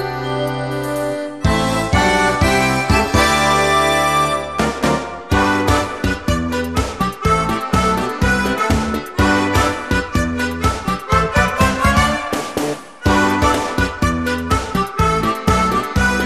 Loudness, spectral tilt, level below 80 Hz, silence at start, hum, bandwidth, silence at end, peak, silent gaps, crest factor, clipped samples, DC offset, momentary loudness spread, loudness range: -17 LUFS; -5 dB/octave; -28 dBFS; 0 s; none; 14 kHz; 0 s; -2 dBFS; none; 16 dB; under 0.1%; 0.5%; 7 LU; 3 LU